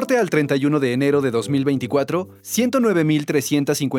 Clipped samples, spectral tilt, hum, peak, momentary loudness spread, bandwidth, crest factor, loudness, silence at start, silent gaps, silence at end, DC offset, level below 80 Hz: under 0.1%; -5.5 dB/octave; none; -4 dBFS; 4 LU; 19.5 kHz; 14 dB; -19 LUFS; 0 s; none; 0 s; under 0.1%; -68 dBFS